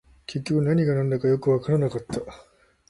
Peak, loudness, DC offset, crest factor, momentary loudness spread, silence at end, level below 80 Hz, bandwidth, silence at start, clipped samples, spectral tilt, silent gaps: -10 dBFS; -24 LUFS; under 0.1%; 14 dB; 12 LU; 0.55 s; -54 dBFS; 11.5 kHz; 0.3 s; under 0.1%; -8 dB/octave; none